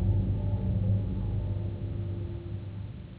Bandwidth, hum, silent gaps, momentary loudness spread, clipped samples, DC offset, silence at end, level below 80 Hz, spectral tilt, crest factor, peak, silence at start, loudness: 4 kHz; none; none; 10 LU; under 0.1%; under 0.1%; 0 s; -36 dBFS; -12.5 dB/octave; 14 dB; -16 dBFS; 0 s; -32 LUFS